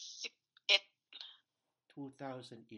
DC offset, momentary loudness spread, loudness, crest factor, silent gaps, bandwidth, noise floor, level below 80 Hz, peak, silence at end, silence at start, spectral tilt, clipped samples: under 0.1%; 21 LU; -36 LUFS; 30 dB; none; 11 kHz; -85 dBFS; under -90 dBFS; -12 dBFS; 0 s; 0 s; -1.5 dB/octave; under 0.1%